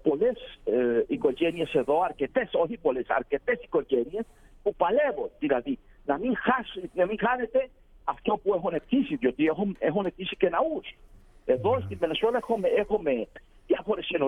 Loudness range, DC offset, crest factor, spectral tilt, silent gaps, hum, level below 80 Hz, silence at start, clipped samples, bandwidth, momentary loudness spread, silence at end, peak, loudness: 1 LU; under 0.1%; 18 dB; -7.5 dB/octave; none; none; -54 dBFS; 0.05 s; under 0.1%; 10.5 kHz; 8 LU; 0 s; -10 dBFS; -27 LUFS